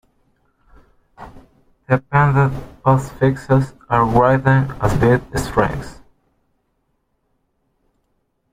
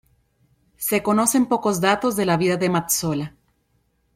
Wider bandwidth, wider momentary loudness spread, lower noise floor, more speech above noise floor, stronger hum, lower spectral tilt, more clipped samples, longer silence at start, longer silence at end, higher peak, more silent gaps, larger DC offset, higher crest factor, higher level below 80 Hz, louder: about the same, 15 kHz vs 16.5 kHz; about the same, 7 LU vs 8 LU; about the same, -68 dBFS vs -67 dBFS; first, 51 dB vs 47 dB; neither; first, -8 dB/octave vs -4.5 dB/octave; neither; first, 1.2 s vs 0.8 s; first, 2.6 s vs 0.85 s; about the same, -2 dBFS vs -2 dBFS; neither; neither; about the same, 18 dB vs 20 dB; first, -38 dBFS vs -56 dBFS; first, -17 LUFS vs -20 LUFS